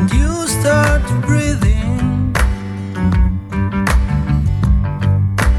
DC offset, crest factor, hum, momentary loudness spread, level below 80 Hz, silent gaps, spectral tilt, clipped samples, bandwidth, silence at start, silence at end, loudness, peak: under 0.1%; 14 dB; none; 5 LU; -18 dBFS; none; -6 dB/octave; under 0.1%; 13 kHz; 0 s; 0 s; -16 LUFS; 0 dBFS